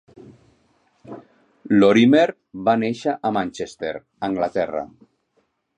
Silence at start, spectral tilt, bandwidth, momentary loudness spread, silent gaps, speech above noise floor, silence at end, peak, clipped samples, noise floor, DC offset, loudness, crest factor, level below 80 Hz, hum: 0.3 s; -6.5 dB/octave; 9.6 kHz; 24 LU; none; 49 dB; 0.9 s; -2 dBFS; under 0.1%; -68 dBFS; under 0.1%; -20 LUFS; 20 dB; -60 dBFS; none